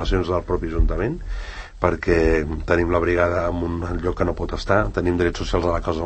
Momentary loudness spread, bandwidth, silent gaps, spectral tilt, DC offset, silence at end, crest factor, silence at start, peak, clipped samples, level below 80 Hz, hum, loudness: 7 LU; 8.6 kHz; none; -7 dB/octave; under 0.1%; 0 s; 20 dB; 0 s; -2 dBFS; under 0.1%; -28 dBFS; none; -22 LUFS